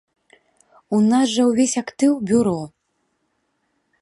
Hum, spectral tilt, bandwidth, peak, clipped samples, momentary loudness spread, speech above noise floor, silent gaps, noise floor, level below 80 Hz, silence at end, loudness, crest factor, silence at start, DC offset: none; -5 dB/octave; 11.5 kHz; -6 dBFS; under 0.1%; 7 LU; 53 dB; none; -70 dBFS; -60 dBFS; 1.35 s; -19 LUFS; 14 dB; 0.9 s; under 0.1%